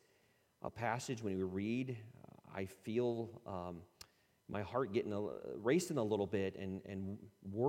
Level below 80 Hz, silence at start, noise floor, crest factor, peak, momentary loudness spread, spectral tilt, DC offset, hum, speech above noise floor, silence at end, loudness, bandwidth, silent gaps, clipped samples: -74 dBFS; 0.65 s; -74 dBFS; 20 dB; -22 dBFS; 14 LU; -6 dB/octave; under 0.1%; none; 34 dB; 0 s; -41 LUFS; 16.5 kHz; none; under 0.1%